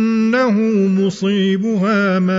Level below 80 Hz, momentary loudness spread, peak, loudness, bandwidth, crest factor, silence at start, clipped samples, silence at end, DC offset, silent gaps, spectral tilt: -60 dBFS; 2 LU; -4 dBFS; -15 LUFS; 7.6 kHz; 10 dB; 0 s; under 0.1%; 0 s; under 0.1%; none; -7 dB/octave